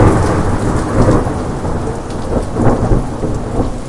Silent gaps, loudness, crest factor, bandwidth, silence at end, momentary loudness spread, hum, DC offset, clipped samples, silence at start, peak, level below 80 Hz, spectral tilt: none; -16 LUFS; 14 dB; 11.5 kHz; 0 s; 8 LU; none; under 0.1%; under 0.1%; 0 s; 0 dBFS; -20 dBFS; -7.5 dB/octave